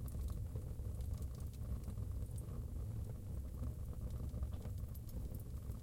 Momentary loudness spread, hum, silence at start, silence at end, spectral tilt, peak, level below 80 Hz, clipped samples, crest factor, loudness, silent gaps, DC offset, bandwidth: 3 LU; none; 0 s; 0 s; -7.5 dB/octave; -30 dBFS; -46 dBFS; under 0.1%; 14 dB; -47 LUFS; none; under 0.1%; 16.5 kHz